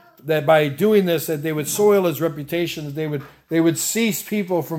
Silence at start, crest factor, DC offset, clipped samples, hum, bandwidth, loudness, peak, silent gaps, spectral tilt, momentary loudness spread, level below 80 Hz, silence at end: 0.25 s; 16 dB; under 0.1%; under 0.1%; none; 17 kHz; -20 LUFS; -4 dBFS; none; -5 dB/octave; 10 LU; -62 dBFS; 0 s